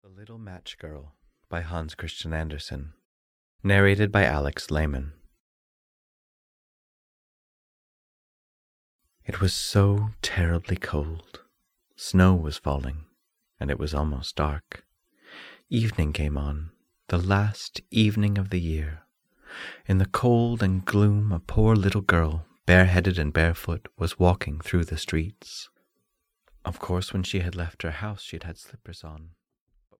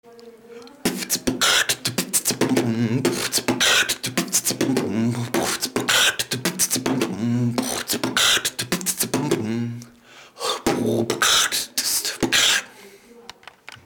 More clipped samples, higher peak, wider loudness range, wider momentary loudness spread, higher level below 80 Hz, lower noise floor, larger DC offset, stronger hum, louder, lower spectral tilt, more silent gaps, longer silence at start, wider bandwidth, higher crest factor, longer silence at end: neither; about the same, -4 dBFS vs -4 dBFS; first, 10 LU vs 2 LU; first, 20 LU vs 7 LU; first, -38 dBFS vs -54 dBFS; first, -77 dBFS vs -47 dBFS; neither; neither; second, -25 LUFS vs -20 LUFS; first, -6.5 dB/octave vs -2.5 dB/octave; first, 3.05-3.59 s, 5.40-8.99 s vs none; about the same, 0.15 s vs 0.05 s; second, 15.5 kHz vs over 20 kHz; about the same, 22 dB vs 18 dB; first, 0.7 s vs 0.1 s